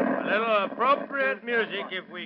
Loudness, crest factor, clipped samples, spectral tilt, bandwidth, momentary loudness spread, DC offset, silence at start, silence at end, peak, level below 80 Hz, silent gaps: -26 LUFS; 16 dB; under 0.1%; -7 dB/octave; 5.6 kHz; 7 LU; under 0.1%; 0 s; 0 s; -10 dBFS; -82 dBFS; none